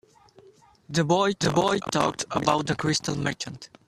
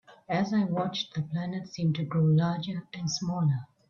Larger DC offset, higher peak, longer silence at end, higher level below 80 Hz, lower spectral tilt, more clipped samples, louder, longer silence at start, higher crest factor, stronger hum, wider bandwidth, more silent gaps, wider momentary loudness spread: neither; first, -4 dBFS vs -14 dBFS; about the same, 0.2 s vs 0.25 s; first, -56 dBFS vs -66 dBFS; second, -4.5 dB/octave vs -6.5 dB/octave; neither; first, -25 LUFS vs -29 LUFS; first, 0.9 s vs 0.1 s; first, 22 dB vs 16 dB; neither; first, 13.5 kHz vs 7.2 kHz; neither; about the same, 7 LU vs 9 LU